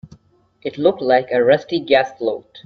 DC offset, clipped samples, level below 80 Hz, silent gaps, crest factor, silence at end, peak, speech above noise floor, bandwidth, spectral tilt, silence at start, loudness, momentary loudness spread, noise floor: under 0.1%; under 0.1%; -60 dBFS; none; 18 dB; 0.05 s; 0 dBFS; 37 dB; 6.6 kHz; -6.5 dB/octave; 0.65 s; -17 LUFS; 10 LU; -54 dBFS